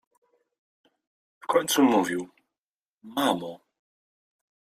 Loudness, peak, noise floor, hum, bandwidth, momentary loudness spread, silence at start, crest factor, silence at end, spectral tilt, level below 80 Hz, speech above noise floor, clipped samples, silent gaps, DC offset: -25 LUFS; -8 dBFS; under -90 dBFS; none; 15.5 kHz; 20 LU; 1.5 s; 20 dB; 1.2 s; -3.5 dB/octave; -72 dBFS; over 66 dB; under 0.1%; 2.58-2.98 s; under 0.1%